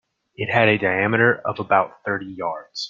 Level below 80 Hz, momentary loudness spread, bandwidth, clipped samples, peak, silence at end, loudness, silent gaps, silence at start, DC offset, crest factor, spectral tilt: -60 dBFS; 11 LU; 7.6 kHz; under 0.1%; -2 dBFS; 0 s; -20 LUFS; none; 0.4 s; under 0.1%; 20 dB; -6 dB/octave